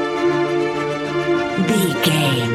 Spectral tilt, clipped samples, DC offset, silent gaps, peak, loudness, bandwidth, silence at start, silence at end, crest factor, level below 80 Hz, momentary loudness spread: -5 dB/octave; under 0.1%; under 0.1%; none; -2 dBFS; -18 LUFS; 16.5 kHz; 0 s; 0 s; 16 dB; -52 dBFS; 5 LU